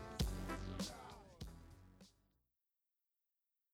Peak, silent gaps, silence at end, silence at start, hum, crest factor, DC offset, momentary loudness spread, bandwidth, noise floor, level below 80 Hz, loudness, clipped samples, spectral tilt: -26 dBFS; none; 1.65 s; 0 s; none; 24 dB; under 0.1%; 22 LU; 17.5 kHz; under -90 dBFS; -54 dBFS; -48 LUFS; under 0.1%; -5 dB/octave